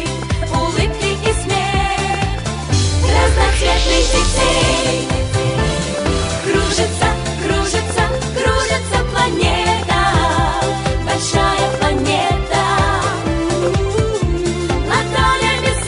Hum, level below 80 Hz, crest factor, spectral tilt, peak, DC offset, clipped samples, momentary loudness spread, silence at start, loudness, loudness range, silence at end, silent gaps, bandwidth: none; -22 dBFS; 14 dB; -4.5 dB/octave; -2 dBFS; under 0.1%; under 0.1%; 4 LU; 0 s; -16 LUFS; 2 LU; 0 s; none; 11 kHz